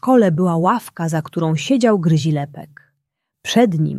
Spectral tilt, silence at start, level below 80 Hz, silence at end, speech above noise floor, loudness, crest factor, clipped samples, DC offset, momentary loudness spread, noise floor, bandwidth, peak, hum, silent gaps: -6.5 dB/octave; 0.05 s; -60 dBFS; 0 s; 59 dB; -17 LUFS; 14 dB; under 0.1%; under 0.1%; 9 LU; -76 dBFS; 13.5 kHz; -2 dBFS; none; none